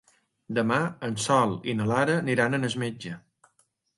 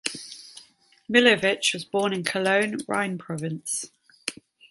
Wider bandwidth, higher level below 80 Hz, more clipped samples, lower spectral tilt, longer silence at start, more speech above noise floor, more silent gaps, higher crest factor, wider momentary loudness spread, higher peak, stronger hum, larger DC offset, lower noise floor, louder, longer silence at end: about the same, 11.5 kHz vs 12 kHz; first, -64 dBFS vs -70 dBFS; neither; first, -5 dB/octave vs -3 dB/octave; first, 0.5 s vs 0.05 s; first, 44 dB vs 32 dB; neither; about the same, 20 dB vs 24 dB; second, 10 LU vs 19 LU; second, -8 dBFS vs -2 dBFS; neither; neither; first, -70 dBFS vs -55 dBFS; about the same, -26 LUFS vs -24 LUFS; first, 0.8 s vs 0.4 s